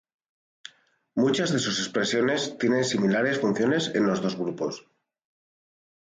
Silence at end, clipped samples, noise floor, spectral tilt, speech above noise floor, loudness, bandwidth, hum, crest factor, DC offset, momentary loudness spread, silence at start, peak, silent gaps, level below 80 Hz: 1.25 s; under 0.1%; -60 dBFS; -4.5 dB/octave; 36 dB; -25 LUFS; 9.6 kHz; none; 16 dB; under 0.1%; 7 LU; 1.15 s; -12 dBFS; none; -68 dBFS